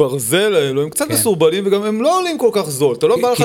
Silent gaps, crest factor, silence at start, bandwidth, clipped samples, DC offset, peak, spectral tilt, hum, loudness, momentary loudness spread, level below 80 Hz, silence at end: none; 14 dB; 0 s; 18 kHz; under 0.1%; under 0.1%; 0 dBFS; -4 dB/octave; none; -15 LUFS; 3 LU; -58 dBFS; 0 s